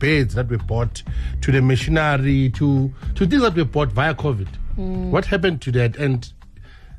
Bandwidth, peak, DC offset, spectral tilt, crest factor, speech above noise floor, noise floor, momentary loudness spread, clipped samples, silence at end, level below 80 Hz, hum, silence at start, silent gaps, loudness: 10.5 kHz; -6 dBFS; under 0.1%; -7 dB/octave; 12 dB; 22 dB; -41 dBFS; 10 LU; under 0.1%; 0 s; -30 dBFS; none; 0 s; none; -20 LUFS